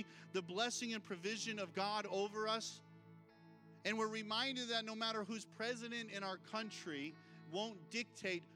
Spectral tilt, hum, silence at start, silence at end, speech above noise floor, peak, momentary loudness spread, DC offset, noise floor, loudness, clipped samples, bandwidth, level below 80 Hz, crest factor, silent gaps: -3 dB/octave; none; 0 s; 0 s; 20 dB; -24 dBFS; 8 LU; under 0.1%; -63 dBFS; -43 LUFS; under 0.1%; 15.5 kHz; under -90 dBFS; 20 dB; none